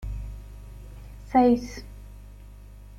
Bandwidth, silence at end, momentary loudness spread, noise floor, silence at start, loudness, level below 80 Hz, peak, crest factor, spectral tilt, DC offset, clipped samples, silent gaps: 13.5 kHz; 0 s; 27 LU; -45 dBFS; 0 s; -23 LUFS; -40 dBFS; -8 dBFS; 20 dB; -7 dB/octave; under 0.1%; under 0.1%; none